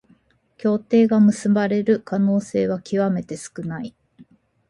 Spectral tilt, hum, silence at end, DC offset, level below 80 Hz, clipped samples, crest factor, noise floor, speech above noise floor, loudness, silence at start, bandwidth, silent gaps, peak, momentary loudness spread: -7.5 dB/octave; none; 0.45 s; under 0.1%; -62 dBFS; under 0.1%; 14 dB; -58 dBFS; 39 dB; -20 LUFS; 0.65 s; 11.5 kHz; none; -6 dBFS; 14 LU